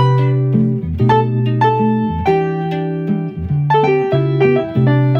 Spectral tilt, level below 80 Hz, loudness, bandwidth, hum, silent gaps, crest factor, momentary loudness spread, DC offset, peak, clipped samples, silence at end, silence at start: -9.5 dB/octave; -38 dBFS; -15 LUFS; 5.6 kHz; none; none; 12 dB; 6 LU; under 0.1%; -2 dBFS; under 0.1%; 0 s; 0 s